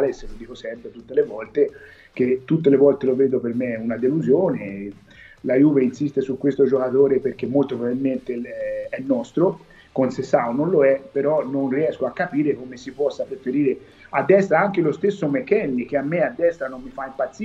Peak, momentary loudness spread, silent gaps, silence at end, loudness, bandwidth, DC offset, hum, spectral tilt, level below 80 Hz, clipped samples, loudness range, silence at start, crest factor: -4 dBFS; 14 LU; none; 0 s; -21 LUFS; 7.8 kHz; under 0.1%; none; -8 dB/octave; -52 dBFS; under 0.1%; 2 LU; 0 s; 18 dB